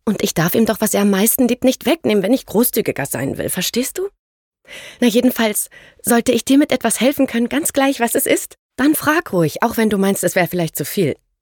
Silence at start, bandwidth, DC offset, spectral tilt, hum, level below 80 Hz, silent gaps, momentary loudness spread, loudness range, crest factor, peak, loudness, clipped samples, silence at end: 0.05 s; 18 kHz; under 0.1%; -4 dB/octave; none; -52 dBFS; 4.19-4.51 s, 8.59-8.69 s; 7 LU; 3 LU; 16 dB; -2 dBFS; -17 LUFS; under 0.1%; 0.25 s